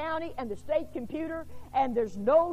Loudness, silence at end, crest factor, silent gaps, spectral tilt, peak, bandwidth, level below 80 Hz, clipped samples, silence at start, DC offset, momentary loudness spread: -31 LUFS; 0 s; 16 dB; none; -7 dB/octave; -12 dBFS; 14 kHz; -52 dBFS; under 0.1%; 0 s; 0.6%; 12 LU